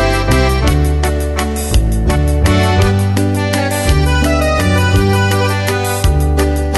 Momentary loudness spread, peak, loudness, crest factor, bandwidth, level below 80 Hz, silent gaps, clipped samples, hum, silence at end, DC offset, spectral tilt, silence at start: 3 LU; 0 dBFS; -13 LUFS; 12 dB; 12.5 kHz; -16 dBFS; none; under 0.1%; none; 0 s; under 0.1%; -5.5 dB/octave; 0 s